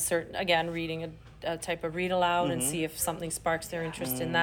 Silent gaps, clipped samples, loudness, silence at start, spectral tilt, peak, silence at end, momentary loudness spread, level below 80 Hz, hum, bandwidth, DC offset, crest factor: none; under 0.1%; -30 LUFS; 0 s; -3.5 dB/octave; -12 dBFS; 0 s; 9 LU; -56 dBFS; none; 20 kHz; under 0.1%; 18 dB